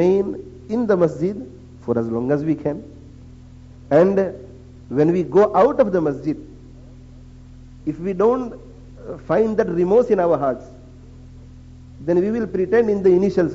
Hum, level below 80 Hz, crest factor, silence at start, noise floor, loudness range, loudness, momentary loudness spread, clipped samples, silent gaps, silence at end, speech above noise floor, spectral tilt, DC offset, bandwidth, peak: none; -46 dBFS; 16 dB; 0 s; -41 dBFS; 5 LU; -19 LUFS; 17 LU; under 0.1%; none; 0 s; 23 dB; -8 dB/octave; under 0.1%; 7.8 kHz; -4 dBFS